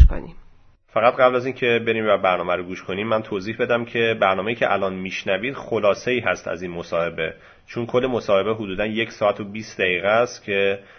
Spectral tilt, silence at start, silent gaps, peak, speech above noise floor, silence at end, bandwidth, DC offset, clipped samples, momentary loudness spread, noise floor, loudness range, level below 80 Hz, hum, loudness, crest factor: -6 dB/octave; 0 s; none; 0 dBFS; 29 dB; 0.2 s; 6.6 kHz; under 0.1%; under 0.1%; 10 LU; -50 dBFS; 3 LU; -32 dBFS; none; -22 LUFS; 22 dB